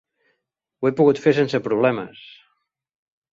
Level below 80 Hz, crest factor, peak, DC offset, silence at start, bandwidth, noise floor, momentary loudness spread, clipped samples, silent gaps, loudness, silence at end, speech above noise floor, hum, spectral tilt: -64 dBFS; 18 dB; -4 dBFS; under 0.1%; 0.8 s; 7.6 kHz; -77 dBFS; 10 LU; under 0.1%; none; -20 LUFS; 1.25 s; 58 dB; none; -7 dB/octave